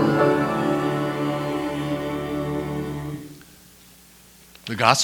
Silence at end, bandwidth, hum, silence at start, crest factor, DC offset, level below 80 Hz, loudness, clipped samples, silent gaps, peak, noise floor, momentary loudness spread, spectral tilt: 0 s; over 20 kHz; none; 0 s; 24 dB; under 0.1%; -50 dBFS; -24 LUFS; under 0.1%; none; 0 dBFS; -50 dBFS; 16 LU; -5 dB/octave